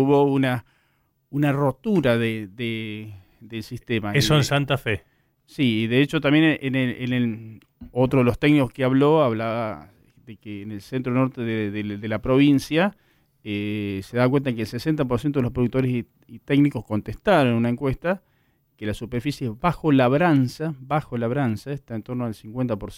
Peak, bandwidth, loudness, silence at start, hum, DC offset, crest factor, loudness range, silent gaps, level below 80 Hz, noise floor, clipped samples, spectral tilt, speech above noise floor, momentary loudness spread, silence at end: -8 dBFS; 16 kHz; -22 LUFS; 0 s; none; under 0.1%; 16 dB; 3 LU; none; -48 dBFS; -67 dBFS; under 0.1%; -6.5 dB/octave; 45 dB; 13 LU; 0 s